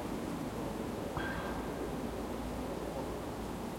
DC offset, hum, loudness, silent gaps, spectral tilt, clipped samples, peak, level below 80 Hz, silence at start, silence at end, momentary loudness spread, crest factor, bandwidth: under 0.1%; none; -39 LUFS; none; -5.5 dB/octave; under 0.1%; -24 dBFS; -50 dBFS; 0 s; 0 s; 3 LU; 14 dB; 16.5 kHz